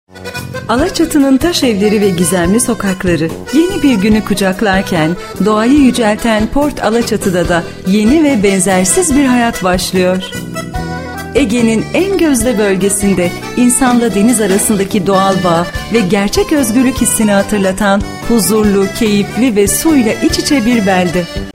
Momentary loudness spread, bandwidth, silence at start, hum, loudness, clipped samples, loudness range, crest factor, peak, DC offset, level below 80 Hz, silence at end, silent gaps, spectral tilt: 6 LU; 16.5 kHz; 0.15 s; none; -11 LUFS; under 0.1%; 2 LU; 12 dB; 0 dBFS; under 0.1%; -30 dBFS; 0.05 s; none; -4.5 dB/octave